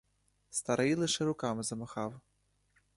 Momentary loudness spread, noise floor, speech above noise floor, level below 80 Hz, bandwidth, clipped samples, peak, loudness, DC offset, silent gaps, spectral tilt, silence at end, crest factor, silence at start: 10 LU; -73 dBFS; 39 dB; -68 dBFS; 11.5 kHz; under 0.1%; -16 dBFS; -34 LUFS; under 0.1%; none; -4 dB/octave; 0.75 s; 20 dB; 0.5 s